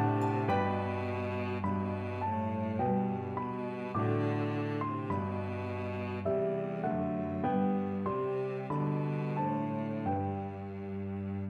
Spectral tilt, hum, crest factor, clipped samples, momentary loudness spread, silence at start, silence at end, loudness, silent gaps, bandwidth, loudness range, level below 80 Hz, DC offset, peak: -9.5 dB/octave; none; 14 dB; under 0.1%; 6 LU; 0 s; 0 s; -34 LUFS; none; 7.6 kHz; 1 LU; -66 dBFS; under 0.1%; -18 dBFS